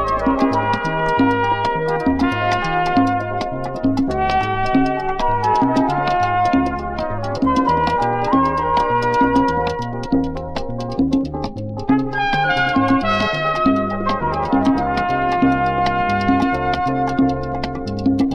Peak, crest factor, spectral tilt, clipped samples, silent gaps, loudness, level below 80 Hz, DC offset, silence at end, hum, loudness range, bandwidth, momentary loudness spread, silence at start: -2 dBFS; 16 dB; -7 dB/octave; under 0.1%; none; -18 LUFS; -34 dBFS; under 0.1%; 0 s; none; 2 LU; 9.2 kHz; 7 LU; 0 s